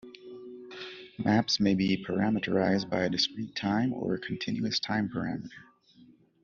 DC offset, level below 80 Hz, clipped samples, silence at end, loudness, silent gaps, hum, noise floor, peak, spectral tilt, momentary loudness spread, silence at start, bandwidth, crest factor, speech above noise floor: under 0.1%; -64 dBFS; under 0.1%; 0.8 s; -29 LUFS; none; none; -59 dBFS; -12 dBFS; -4 dB/octave; 18 LU; 0.05 s; 7.4 kHz; 18 dB; 30 dB